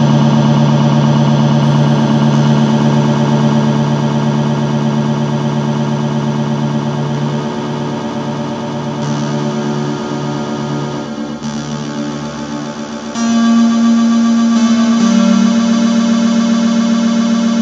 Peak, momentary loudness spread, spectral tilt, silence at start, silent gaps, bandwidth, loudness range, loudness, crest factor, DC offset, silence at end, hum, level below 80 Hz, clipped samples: 0 dBFS; 10 LU; -6.5 dB/octave; 0 s; none; 7.8 kHz; 8 LU; -13 LUFS; 12 dB; under 0.1%; 0 s; none; -48 dBFS; under 0.1%